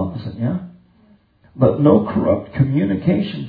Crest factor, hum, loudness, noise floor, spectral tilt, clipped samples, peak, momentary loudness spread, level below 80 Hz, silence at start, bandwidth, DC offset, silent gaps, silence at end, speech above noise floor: 18 dB; none; -18 LUFS; -53 dBFS; -12 dB/octave; under 0.1%; 0 dBFS; 10 LU; -48 dBFS; 0 s; 4.9 kHz; under 0.1%; none; 0 s; 37 dB